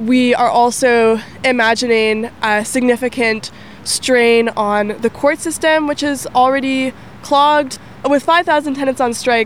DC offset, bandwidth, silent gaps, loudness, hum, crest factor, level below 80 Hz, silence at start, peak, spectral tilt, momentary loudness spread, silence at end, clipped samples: 0.6%; 16 kHz; none; -14 LUFS; none; 12 dB; -50 dBFS; 0 s; -2 dBFS; -3 dB/octave; 7 LU; 0 s; under 0.1%